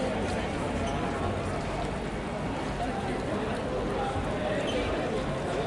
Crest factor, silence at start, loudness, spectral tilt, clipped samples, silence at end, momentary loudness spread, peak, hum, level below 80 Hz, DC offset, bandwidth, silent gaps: 14 dB; 0 s; -31 LUFS; -6 dB/octave; under 0.1%; 0 s; 3 LU; -16 dBFS; none; -42 dBFS; under 0.1%; 11.5 kHz; none